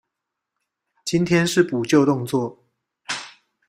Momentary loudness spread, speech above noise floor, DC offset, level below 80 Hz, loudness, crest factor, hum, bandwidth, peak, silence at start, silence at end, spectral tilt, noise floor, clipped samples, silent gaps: 14 LU; 63 dB; under 0.1%; -60 dBFS; -21 LUFS; 20 dB; none; 16 kHz; -4 dBFS; 1.05 s; 0.4 s; -5.5 dB/octave; -82 dBFS; under 0.1%; none